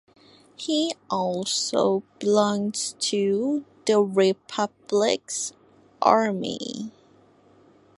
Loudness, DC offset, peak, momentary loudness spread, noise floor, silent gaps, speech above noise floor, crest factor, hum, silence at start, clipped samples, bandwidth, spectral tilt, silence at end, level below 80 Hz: -24 LUFS; under 0.1%; -2 dBFS; 10 LU; -57 dBFS; none; 33 dB; 22 dB; none; 0.6 s; under 0.1%; 11.5 kHz; -4 dB/octave; 1.1 s; -72 dBFS